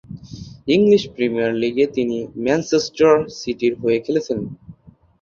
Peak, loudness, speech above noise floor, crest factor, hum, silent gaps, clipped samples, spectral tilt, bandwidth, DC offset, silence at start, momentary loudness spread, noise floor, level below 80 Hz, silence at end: -2 dBFS; -19 LUFS; 31 dB; 18 dB; none; none; under 0.1%; -5.5 dB/octave; 7.4 kHz; under 0.1%; 0.1 s; 14 LU; -49 dBFS; -52 dBFS; 0.5 s